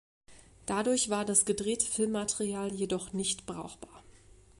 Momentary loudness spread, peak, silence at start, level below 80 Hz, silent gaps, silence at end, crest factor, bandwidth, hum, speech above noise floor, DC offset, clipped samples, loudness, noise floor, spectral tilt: 17 LU; -12 dBFS; 0.3 s; -60 dBFS; none; 0.5 s; 22 dB; 11.5 kHz; none; 25 dB; under 0.1%; under 0.1%; -30 LUFS; -57 dBFS; -3 dB/octave